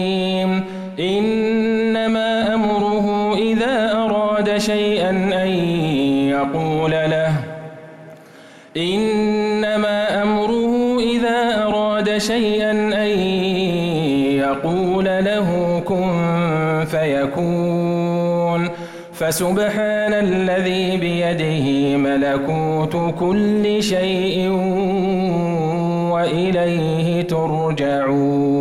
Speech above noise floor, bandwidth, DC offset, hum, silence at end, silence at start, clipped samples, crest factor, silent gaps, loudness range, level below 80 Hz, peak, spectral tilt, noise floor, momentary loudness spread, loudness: 25 dB; 16.5 kHz; under 0.1%; none; 0 s; 0 s; under 0.1%; 8 dB; none; 2 LU; -48 dBFS; -10 dBFS; -6 dB/octave; -43 dBFS; 2 LU; -18 LUFS